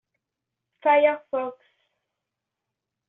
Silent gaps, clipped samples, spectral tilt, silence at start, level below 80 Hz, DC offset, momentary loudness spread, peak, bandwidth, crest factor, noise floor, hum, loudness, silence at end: none; under 0.1%; -0.5 dB/octave; 0.85 s; -80 dBFS; under 0.1%; 11 LU; -8 dBFS; 3.9 kHz; 20 dB; -85 dBFS; none; -23 LUFS; 1.55 s